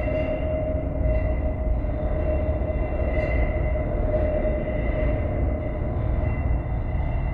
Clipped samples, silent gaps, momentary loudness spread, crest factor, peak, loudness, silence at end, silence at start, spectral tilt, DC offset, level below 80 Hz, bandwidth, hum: under 0.1%; none; 3 LU; 12 dB; -10 dBFS; -26 LUFS; 0 s; 0 s; -11 dB/octave; under 0.1%; -26 dBFS; 3.9 kHz; none